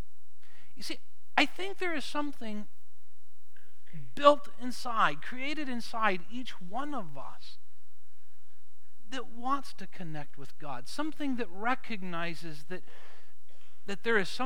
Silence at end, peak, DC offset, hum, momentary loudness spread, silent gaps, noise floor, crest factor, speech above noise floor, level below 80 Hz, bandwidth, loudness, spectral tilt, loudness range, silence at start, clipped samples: 0 s; -6 dBFS; 5%; none; 18 LU; none; -71 dBFS; 28 dB; 37 dB; -80 dBFS; over 20 kHz; -33 LUFS; -4.5 dB/octave; 11 LU; 0.75 s; under 0.1%